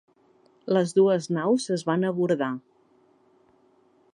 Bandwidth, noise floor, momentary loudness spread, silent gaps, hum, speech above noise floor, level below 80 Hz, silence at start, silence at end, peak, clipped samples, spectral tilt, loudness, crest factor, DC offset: 11 kHz; -62 dBFS; 9 LU; none; none; 38 dB; -76 dBFS; 0.65 s; 1.55 s; -8 dBFS; under 0.1%; -6 dB/octave; -24 LUFS; 18 dB; under 0.1%